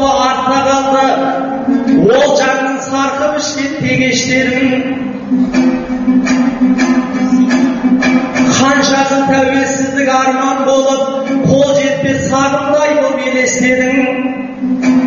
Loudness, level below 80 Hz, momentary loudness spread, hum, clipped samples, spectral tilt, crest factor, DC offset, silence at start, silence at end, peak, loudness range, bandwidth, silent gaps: -12 LUFS; -44 dBFS; 5 LU; none; under 0.1%; -4 dB/octave; 12 dB; under 0.1%; 0 s; 0 s; 0 dBFS; 2 LU; 7.4 kHz; none